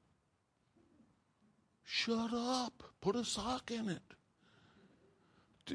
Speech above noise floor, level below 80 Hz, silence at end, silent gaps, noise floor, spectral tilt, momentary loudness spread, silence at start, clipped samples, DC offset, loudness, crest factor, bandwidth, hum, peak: 40 dB; -70 dBFS; 0 s; none; -79 dBFS; -3.5 dB/octave; 8 LU; 1.85 s; under 0.1%; under 0.1%; -39 LUFS; 22 dB; 10.5 kHz; none; -22 dBFS